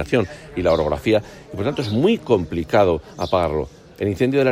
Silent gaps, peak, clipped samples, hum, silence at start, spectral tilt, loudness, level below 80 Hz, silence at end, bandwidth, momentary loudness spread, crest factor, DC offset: none; -2 dBFS; under 0.1%; none; 0 s; -7 dB/octave; -20 LUFS; -42 dBFS; 0 s; 16 kHz; 9 LU; 16 dB; under 0.1%